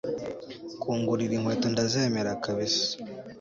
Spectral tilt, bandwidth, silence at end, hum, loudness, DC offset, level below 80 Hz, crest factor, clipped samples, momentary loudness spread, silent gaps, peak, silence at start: -4.5 dB/octave; 7.6 kHz; 0 s; none; -28 LUFS; under 0.1%; -62 dBFS; 16 dB; under 0.1%; 13 LU; none; -14 dBFS; 0.05 s